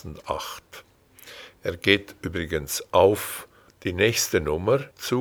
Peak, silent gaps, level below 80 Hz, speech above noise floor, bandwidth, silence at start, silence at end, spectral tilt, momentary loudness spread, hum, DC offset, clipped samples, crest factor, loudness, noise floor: -2 dBFS; none; -48 dBFS; 24 dB; over 20 kHz; 0.05 s; 0 s; -4 dB/octave; 17 LU; none; under 0.1%; under 0.1%; 24 dB; -24 LUFS; -48 dBFS